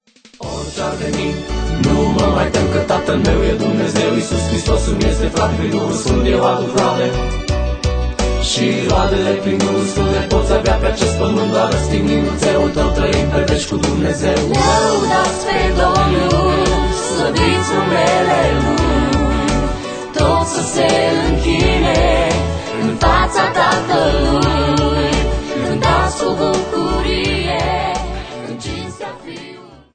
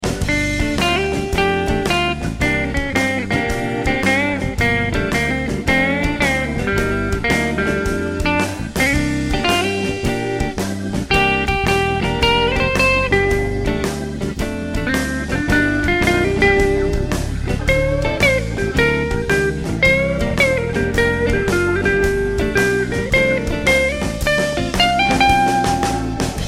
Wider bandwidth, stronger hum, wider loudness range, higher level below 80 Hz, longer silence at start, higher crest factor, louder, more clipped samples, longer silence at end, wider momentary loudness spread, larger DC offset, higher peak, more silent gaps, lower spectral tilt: second, 9.4 kHz vs 16.5 kHz; neither; about the same, 2 LU vs 2 LU; first, -22 dBFS vs -28 dBFS; first, 0.4 s vs 0 s; about the same, 14 dB vs 16 dB; about the same, -15 LUFS vs -17 LUFS; neither; first, 0.2 s vs 0 s; about the same, 7 LU vs 6 LU; neither; about the same, 0 dBFS vs 0 dBFS; neither; about the same, -5 dB/octave vs -5 dB/octave